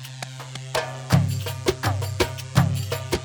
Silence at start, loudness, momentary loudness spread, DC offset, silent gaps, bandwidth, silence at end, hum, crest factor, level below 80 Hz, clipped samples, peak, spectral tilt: 0 s; -25 LUFS; 13 LU; under 0.1%; none; over 20 kHz; 0 s; none; 20 dB; -42 dBFS; under 0.1%; -4 dBFS; -5 dB/octave